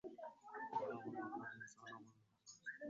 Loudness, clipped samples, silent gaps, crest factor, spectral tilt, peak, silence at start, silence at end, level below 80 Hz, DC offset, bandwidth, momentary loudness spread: -50 LUFS; under 0.1%; none; 20 dB; -4 dB/octave; -32 dBFS; 0.05 s; 0 s; -90 dBFS; under 0.1%; 7.6 kHz; 16 LU